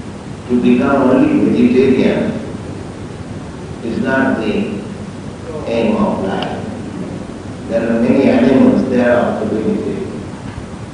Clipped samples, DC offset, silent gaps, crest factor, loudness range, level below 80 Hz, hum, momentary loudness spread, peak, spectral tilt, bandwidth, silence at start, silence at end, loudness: under 0.1%; under 0.1%; none; 14 dB; 6 LU; -42 dBFS; none; 17 LU; 0 dBFS; -7.5 dB/octave; 10 kHz; 0 s; 0 s; -14 LUFS